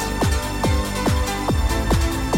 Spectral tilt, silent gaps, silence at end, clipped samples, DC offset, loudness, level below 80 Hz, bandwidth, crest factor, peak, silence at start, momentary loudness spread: -5 dB/octave; none; 0 s; under 0.1%; under 0.1%; -21 LUFS; -24 dBFS; 17 kHz; 12 dB; -8 dBFS; 0 s; 1 LU